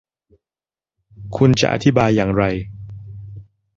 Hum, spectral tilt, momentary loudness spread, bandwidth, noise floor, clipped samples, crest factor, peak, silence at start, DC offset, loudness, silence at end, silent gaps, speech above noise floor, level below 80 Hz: none; -6.5 dB/octave; 21 LU; 7.8 kHz; under -90 dBFS; under 0.1%; 18 dB; -2 dBFS; 1.2 s; under 0.1%; -17 LUFS; 0.35 s; none; over 74 dB; -42 dBFS